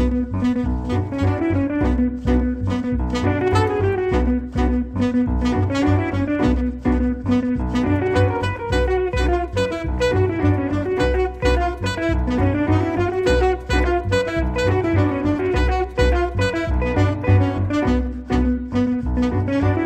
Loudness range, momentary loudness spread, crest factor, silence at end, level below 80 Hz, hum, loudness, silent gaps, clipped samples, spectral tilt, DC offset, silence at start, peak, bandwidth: 1 LU; 3 LU; 14 dB; 0 s; -26 dBFS; none; -20 LUFS; none; under 0.1%; -7.5 dB/octave; under 0.1%; 0 s; -4 dBFS; 9 kHz